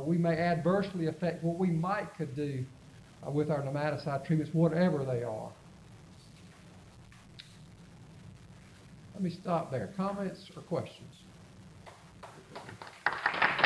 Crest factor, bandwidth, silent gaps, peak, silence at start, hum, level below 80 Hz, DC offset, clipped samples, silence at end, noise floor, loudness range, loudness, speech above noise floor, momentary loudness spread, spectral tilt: 22 dB; 11 kHz; none; -12 dBFS; 0 s; none; -64 dBFS; under 0.1%; under 0.1%; 0 s; -54 dBFS; 14 LU; -33 LUFS; 22 dB; 25 LU; -7.5 dB/octave